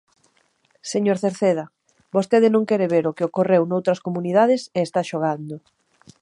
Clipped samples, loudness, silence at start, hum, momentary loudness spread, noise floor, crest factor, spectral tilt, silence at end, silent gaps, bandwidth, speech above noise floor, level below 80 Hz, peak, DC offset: under 0.1%; -21 LUFS; 0.85 s; none; 10 LU; -63 dBFS; 16 dB; -6.5 dB/octave; 0.65 s; none; 11.5 kHz; 43 dB; -72 dBFS; -4 dBFS; under 0.1%